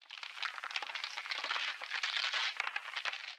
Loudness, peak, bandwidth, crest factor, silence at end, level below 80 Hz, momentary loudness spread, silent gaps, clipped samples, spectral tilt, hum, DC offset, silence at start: -37 LUFS; -18 dBFS; 18 kHz; 22 dB; 0 s; under -90 dBFS; 7 LU; none; under 0.1%; 4.5 dB/octave; none; under 0.1%; 0 s